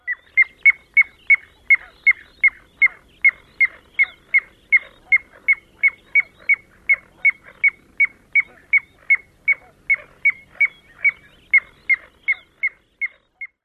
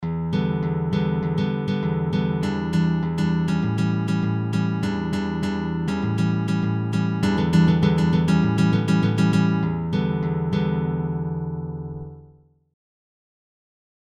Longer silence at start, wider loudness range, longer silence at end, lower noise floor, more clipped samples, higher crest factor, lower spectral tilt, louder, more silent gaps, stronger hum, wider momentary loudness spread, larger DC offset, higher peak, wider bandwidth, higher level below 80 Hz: about the same, 0.05 s vs 0 s; second, 3 LU vs 7 LU; second, 0.2 s vs 1.75 s; second, -39 dBFS vs -52 dBFS; neither; about the same, 16 dB vs 16 dB; second, -2.5 dB/octave vs -8 dB/octave; first, -18 LUFS vs -22 LUFS; neither; neither; about the same, 6 LU vs 6 LU; neither; about the same, -4 dBFS vs -6 dBFS; second, 4.6 kHz vs 10 kHz; second, -60 dBFS vs -44 dBFS